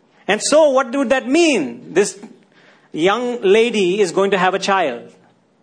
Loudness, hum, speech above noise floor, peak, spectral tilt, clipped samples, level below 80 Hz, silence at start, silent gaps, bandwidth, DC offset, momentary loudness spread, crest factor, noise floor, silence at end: -16 LUFS; none; 35 dB; -2 dBFS; -3.5 dB/octave; under 0.1%; -62 dBFS; 0.3 s; none; 10.5 kHz; under 0.1%; 8 LU; 16 dB; -51 dBFS; 0.55 s